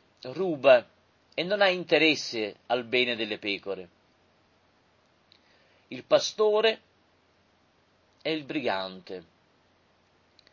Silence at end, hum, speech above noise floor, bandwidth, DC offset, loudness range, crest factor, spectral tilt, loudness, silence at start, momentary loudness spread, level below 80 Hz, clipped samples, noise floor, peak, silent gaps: 1.3 s; none; 39 dB; 7.2 kHz; under 0.1%; 11 LU; 22 dB; -3.5 dB/octave; -26 LUFS; 0.25 s; 17 LU; -76 dBFS; under 0.1%; -66 dBFS; -8 dBFS; none